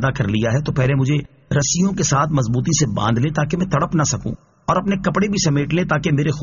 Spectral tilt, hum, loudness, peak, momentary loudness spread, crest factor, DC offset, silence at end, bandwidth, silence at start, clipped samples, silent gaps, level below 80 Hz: -6 dB/octave; none; -19 LUFS; -4 dBFS; 3 LU; 14 dB; under 0.1%; 0 s; 7.4 kHz; 0 s; under 0.1%; none; -40 dBFS